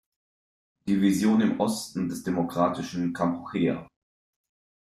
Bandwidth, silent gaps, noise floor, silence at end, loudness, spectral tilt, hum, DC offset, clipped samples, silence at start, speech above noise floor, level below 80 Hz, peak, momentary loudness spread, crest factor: 15 kHz; none; under -90 dBFS; 1 s; -26 LUFS; -6 dB/octave; none; under 0.1%; under 0.1%; 0.85 s; over 65 dB; -64 dBFS; -10 dBFS; 8 LU; 16 dB